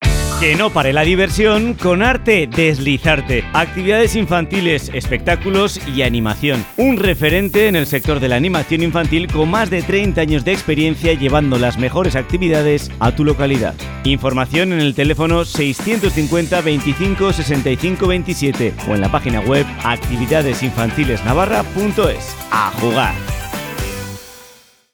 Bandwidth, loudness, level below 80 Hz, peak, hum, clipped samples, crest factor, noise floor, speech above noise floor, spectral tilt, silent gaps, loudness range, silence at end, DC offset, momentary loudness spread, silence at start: over 20 kHz; -15 LUFS; -28 dBFS; 0 dBFS; none; under 0.1%; 16 dB; -45 dBFS; 30 dB; -5.5 dB/octave; none; 3 LU; 0.45 s; under 0.1%; 5 LU; 0 s